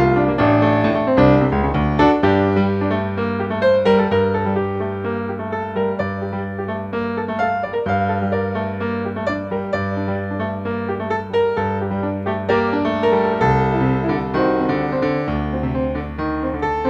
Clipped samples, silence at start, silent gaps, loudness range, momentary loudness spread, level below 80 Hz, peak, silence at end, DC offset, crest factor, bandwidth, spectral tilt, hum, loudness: under 0.1%; 0 s; none; 6 LU; 9 LU; -36 dBFS; -2 dBFS; 0 s; under 0.1%; 16 dB; 7.4 kHz; -8.5 dB/octave; none; -19 LUFS